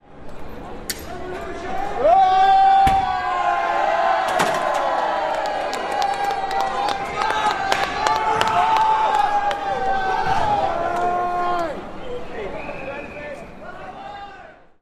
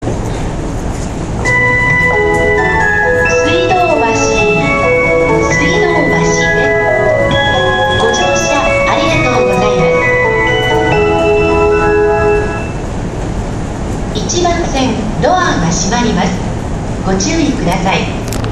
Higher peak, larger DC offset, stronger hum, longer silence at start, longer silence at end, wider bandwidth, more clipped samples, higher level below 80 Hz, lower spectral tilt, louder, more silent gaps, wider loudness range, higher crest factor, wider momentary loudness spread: about the same, 0 dBFS vs 0 dBFS; neither; neither; about the same, 0.1 s vs 0 s; first, 0.3 s vs 0 s; first, 15.5 kHz vs 13.5 kHz; neither; second, -42 dBFS vs -24 dBFS; about the same, -3.5 dB/octave vs -4.5 dB/octave; second, -20 LUFS vs -11 LUFS; neither; first, 8 LU vs 4 LU; first, 20 dB vs 12 dB; first, 19 LU vs 9 LU